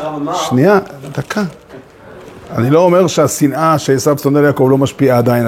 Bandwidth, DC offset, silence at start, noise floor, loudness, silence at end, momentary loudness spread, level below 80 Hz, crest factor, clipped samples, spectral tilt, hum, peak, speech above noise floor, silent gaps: 16.5 kHz; under 0.1%; 0 s; -36 dBFS; -12 LUFS; 0 s; 10 LU; -50 dBFS; 12 dB; under 0.1%; -6 dB/octave; none; 0 dBFS; 24 dB; none